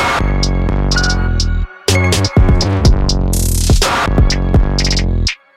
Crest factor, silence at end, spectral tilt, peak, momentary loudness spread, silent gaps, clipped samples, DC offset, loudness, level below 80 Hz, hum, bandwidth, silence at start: 10 dB; 0.25 s; -4.5 dB/octave; -2 dBFS; 4 LU; none; under 0.1%; under 0.1%; -14 LUFS; -16 dBFS; none; 14.5 kHz; 0 s